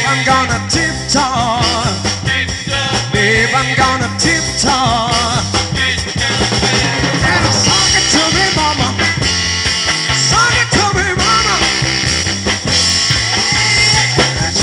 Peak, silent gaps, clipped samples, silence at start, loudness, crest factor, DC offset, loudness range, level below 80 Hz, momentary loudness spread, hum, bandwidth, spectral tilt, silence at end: 0 dBFS; none; under 0.1%; 0 s; -12 LUFS; 12 dB; under 0.1%; 2 LU; -30 dBFS; 5 LU; none; 12 kHz; -2.5 dB/octave; 0 s